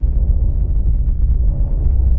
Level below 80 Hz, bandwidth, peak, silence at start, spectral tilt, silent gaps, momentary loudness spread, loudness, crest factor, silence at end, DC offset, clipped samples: -14 dBFS; 1.2 kHz; -4 dBFS; 0 s; -14.5 dB/octave; none; 1 LU; -19 LUFS; 10 dB; 0 s; under 0.1%; under 0.1%